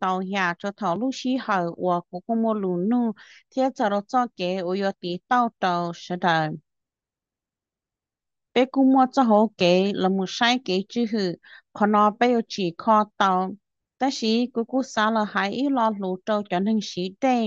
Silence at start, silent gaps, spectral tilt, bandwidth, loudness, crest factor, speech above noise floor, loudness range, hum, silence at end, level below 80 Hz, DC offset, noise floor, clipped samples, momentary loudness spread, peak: 0 s; none; -5.5 dB/octave; 7.8 kHz; -23 LUFS; 18 dB; 67 dB; 5 LU; none; 0 s; -72 dBFS; under 0.1%; -90 dBFS; under 0.1%; 9 LU; -6 dBFS